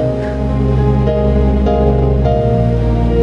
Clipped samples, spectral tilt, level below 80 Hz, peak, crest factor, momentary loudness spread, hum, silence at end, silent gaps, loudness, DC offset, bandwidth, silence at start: under 0.1%; -10 dB/octave; -16 dBFS; 0 dBFS; 12 dB; 3 LU; none; 0 s; none; -14 LUFS; under 0.1%; 5.8 kHz; 0 s